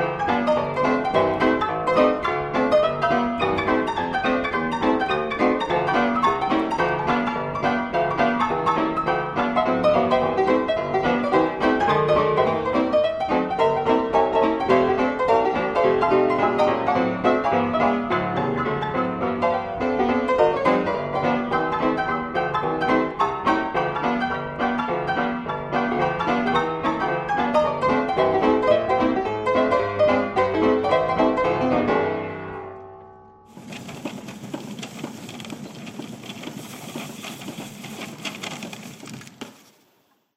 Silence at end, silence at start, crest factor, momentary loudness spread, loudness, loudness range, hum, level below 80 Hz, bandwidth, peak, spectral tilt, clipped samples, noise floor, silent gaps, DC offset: 0.85 s; 0 s; 18 dB; 15 LU; -21 LUFS; 14 LU; none; -50 dBFS; 15 kHz; -4 dBFS; -6 dB/octave; under 0.1%; -64 dBFS; none; under 0.1%